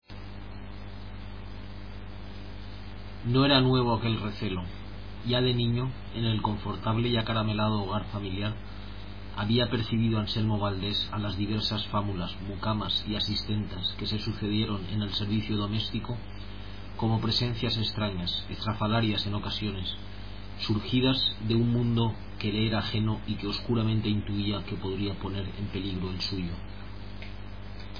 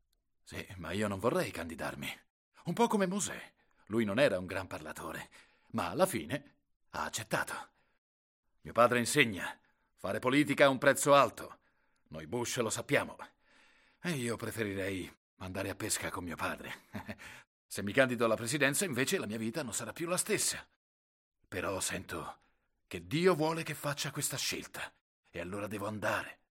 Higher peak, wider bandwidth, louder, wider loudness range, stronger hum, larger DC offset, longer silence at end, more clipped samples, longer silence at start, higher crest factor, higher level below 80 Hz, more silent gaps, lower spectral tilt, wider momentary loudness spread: about the same, -10 dBFS vs -8 dBFS; second, 5.2 kHz vs 16.5 kHz; first, -29 LUFS vs -33 LUFS; second, 3 LU vs 8 LU; first, 50 Hz at -45 dBFS vs none; first, 0.8% vs under 0.1%; second, 0 s vs 0.15 s; neither; second, 0 s vs 0.5 s; second, 20 dB vs 26 dB; first, -44 dBFS vs -68 dBFS; second, none vs 2.30-2.52 s, 6.76-6.80 s, 7.98-8.43 s, 15.17-15.37 s, 17.47-17.69 s, 20.76-21.32 s, 25.01-25.23 s; first, -7.5 dB/octave vs -4 dB/octave; about the same, 17 LU vs 18 LU